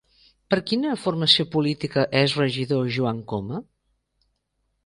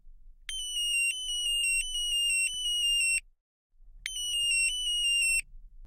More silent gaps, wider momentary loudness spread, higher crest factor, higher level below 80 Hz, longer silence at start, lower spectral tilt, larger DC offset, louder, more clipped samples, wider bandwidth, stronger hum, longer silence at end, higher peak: second, none vs 3.41-3.70 s; about the same, 12 LU vs 10 LU; first, 22 dB vs 16 dB; second, -58 dBFS vs -48 dBFS; first, 0.5 s vs 0.05 s; first, -5.5 dB/octave vs 5.5 dB/octave; neither; first, -22 LUFS vs -27 LUFS; neither; second, 11 kHz vs 15.5 kHz; neither; first, 1.25 s vs 0 s; first, -2 dBFS vs -16 dBFS